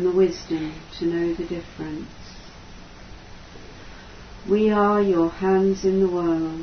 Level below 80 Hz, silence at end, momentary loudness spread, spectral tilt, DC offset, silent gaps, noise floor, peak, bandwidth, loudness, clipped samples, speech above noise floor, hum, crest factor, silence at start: -46 dBFS; 0 s; 24 LU; -7 dB/octave; under 0.1%; none; -42 dBFS; -6 dBFS; 6.6 kHz; -22 LUFS; under 0.1%; 20 dB; none; 16 dB; 0 s